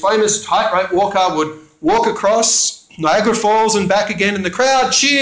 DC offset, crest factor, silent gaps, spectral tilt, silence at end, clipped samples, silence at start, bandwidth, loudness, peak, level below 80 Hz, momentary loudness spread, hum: under 0.1%; 14 dB; none; -2.5 dB/octave; 0 s; under 0.1%; 0 s; 8 kHz; -14 LUFS; -2 dBFS; -50 dBFS; 5 LU; none